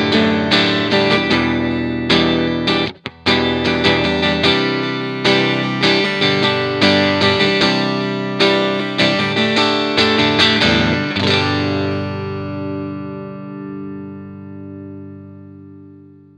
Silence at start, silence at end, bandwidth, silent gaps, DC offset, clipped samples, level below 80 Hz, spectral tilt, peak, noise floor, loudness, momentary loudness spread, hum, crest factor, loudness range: 0 s; 0.45 s; 11 kHz; none; under 0.1%; under 0.1%; -44 dBFS; -5 dB/octave; 0 dBFS; -42 dBFS; -15 LUFS; 16 LU; 50 Hz at -45 dBFS; 16 dB; 13 LU